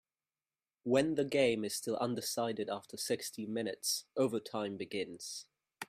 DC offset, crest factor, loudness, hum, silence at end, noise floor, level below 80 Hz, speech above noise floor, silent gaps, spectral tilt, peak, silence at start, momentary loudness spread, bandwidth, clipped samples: under 0.1%; 20 dB; -36 LUFS; none; 0.05 s; under -90 dBFS; -76 dBFS; over 54 dB; none; -3.5 dB/octave; -16 dBFS; 0.85 s; 10 LU; 15.5 kHz; under 0.1%